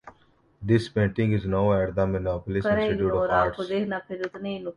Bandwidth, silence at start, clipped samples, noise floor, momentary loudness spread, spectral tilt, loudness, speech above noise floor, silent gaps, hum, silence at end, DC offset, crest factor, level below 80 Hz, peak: 11 kHz; 0.05 s; under 0.1%; -61 dBFS; 9 LU; -8 dB/octave; -25 LUFS; 36 dB; none; none; 0.05 s; under 0.1%; 16 dB; -44 dBFS; -8 dBFS